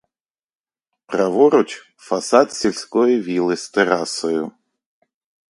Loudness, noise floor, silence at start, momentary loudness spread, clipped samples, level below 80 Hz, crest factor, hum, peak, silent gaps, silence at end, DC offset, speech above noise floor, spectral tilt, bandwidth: -18 LUFS; -89 dBFS; 1.1 s; 11 LU; under 0.1%; -66 dBFS; 20 dB; none; 0 dBFS; none; 1 s; under 0.1%; 71 dB; -4 dB/octave; 11.5 kHz